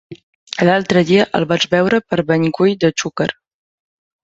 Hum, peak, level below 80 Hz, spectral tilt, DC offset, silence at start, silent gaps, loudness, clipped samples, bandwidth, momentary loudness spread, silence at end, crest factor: none; -2 dBFS; -54 dBFS; -5.5 dB/octave; under 0.1%; 0.1 s; 0.23-0.47 s; -15 LUFS; under 0.1%; 8 kHz; 7 LU; 0.9 s; 16 dB